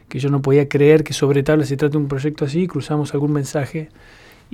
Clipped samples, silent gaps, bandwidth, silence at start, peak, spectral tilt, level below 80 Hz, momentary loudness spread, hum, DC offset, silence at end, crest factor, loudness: under 0.1%; none; 13.5 kHz; 0.1 s; 0 dBFS; -7 dB/octave; -48 dBFS; 10 LU; none; under 0.1%; 0.65 s; 18 dB; -18 LUFS